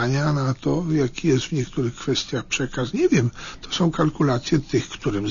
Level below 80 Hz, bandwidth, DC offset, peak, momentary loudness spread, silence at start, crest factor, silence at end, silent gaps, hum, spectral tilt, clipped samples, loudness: -44 dBFS; 7.4 kHz; under 0.1%; -8 dBFS; 6 LU; 0 s; 14 dB; 0 s; none; none; -5.5 dB/octave; under 0.1%; -23 LUFS